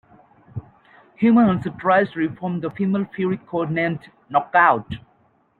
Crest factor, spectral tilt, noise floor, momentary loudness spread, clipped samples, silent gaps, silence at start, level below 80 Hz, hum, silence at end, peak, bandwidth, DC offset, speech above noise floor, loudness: 20 dB; -9.5 dB/octave; -60 dBFS; 20 LU; under 0.1%; none; 0.55 s; -56 dBFS; none; 0.6 s; -2 dBFS; 4.4 kHz; under 0.1%; 41 dB; -20 LUFS